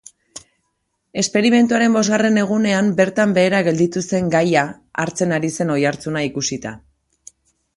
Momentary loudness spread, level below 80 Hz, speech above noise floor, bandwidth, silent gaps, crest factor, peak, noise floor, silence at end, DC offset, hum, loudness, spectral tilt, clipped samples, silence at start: 13 LU; -56 dBFS; 54 dB; 11.5 kHz; none; 18 dB; -2 dBFS; -71 dBFS; 1 s; under 0.1%; none; -17 LUFS; -5 dB/octave; under 0.1%; 1.15 s